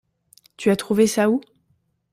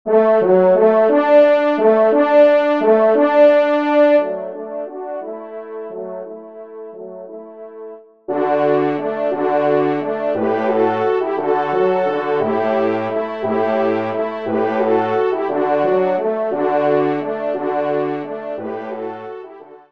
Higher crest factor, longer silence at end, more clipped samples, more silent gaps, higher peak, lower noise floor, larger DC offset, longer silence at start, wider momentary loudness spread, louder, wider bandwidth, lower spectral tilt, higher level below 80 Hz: about the same, 18 dB vs 16 dB; first, 0.75 s vs 0.15 s; neither; neither; about the same, -4 dBFS vs -2 dBFS; first, -67 dBFS vs -38 dBFS; second, under 0.1% vs 0.3%; first, 0.6 s vs 0.05 s; second, 7 LU vs 20 LU; second, -20 LUFS vs -16 LUFS; first, 16 kHz vs 5.8 kHz; second, -5 dB/octave vs -8 dB/octave; first, -62 dBFS vs -70 dBFS